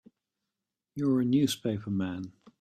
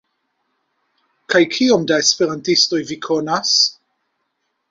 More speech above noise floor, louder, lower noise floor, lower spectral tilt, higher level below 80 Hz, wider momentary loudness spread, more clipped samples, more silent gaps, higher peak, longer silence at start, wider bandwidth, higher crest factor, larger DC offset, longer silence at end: first, 60 dB vs 55 dB; second, -29 LUFS vs -16 LUFS; first, -88 dBFS vs -71 dBFS; first, -6 dB/octave vs -2.5 dB/octave; second, -68 dBFS vs -62 dBFS; first, 17 LU vs 6 LU; neither; neither; second, -14 dBFS vs -2 dBFS; second, 0.95 s vs 1.3 s; first, 14 kHz vs 7.8 kHz; about the same, 16 dB vs 18 dB; neither; second, 0.3 s vs 1 s